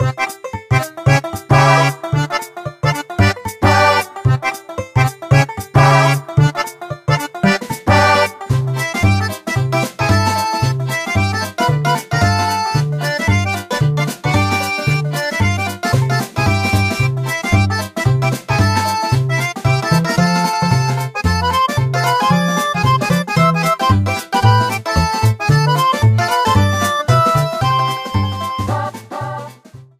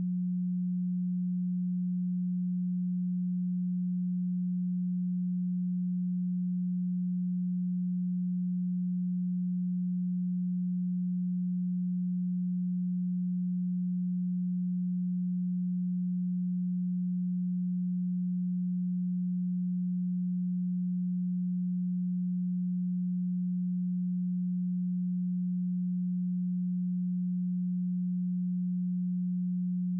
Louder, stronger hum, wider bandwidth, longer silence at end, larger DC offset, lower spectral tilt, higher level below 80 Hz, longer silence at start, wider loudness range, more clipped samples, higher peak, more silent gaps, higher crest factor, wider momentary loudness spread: first, -15 LUFS vs -32 LUFS; neither; first, 15.5 kHz vs 0.3 kHz; first, 0.15 s vs 0 s; neither; second, -5.5 dB/octave vs -27 dB/octave; first, -36 dBFS vs under -90 dBFS; about the same, 0 s vs 0 s; about the same, 2 LU vs 0 LU; neither; first, 0 dBFS vs -28 dBFS; neither; first, 16 dB vs 4 dB; first, 7 LU vs 0 LU